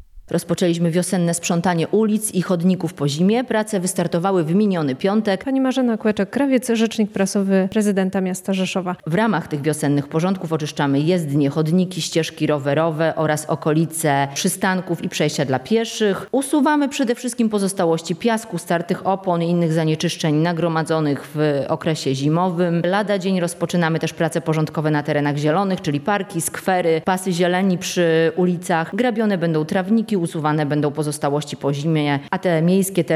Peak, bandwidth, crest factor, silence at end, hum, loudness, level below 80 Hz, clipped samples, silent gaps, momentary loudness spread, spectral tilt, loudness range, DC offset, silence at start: -4 dBFS; 14.5 kHz; 14 dB; 0 s; none; -20 LUFS; -60 dBFS; under 0.1%; none; 4 LU; -5.5 dB/octave; 1 LU; under 0.1%; 0 s